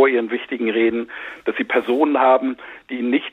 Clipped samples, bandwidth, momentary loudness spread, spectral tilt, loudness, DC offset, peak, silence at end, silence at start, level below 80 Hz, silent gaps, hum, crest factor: under 0.1%; 4.1 kHz; 12 LU; -6.5 dB/octave; -19 LUFS; under 0.1%; -4 dBFS; 0.05 s; 0 s; -64 dBFS; none; none; 16 dB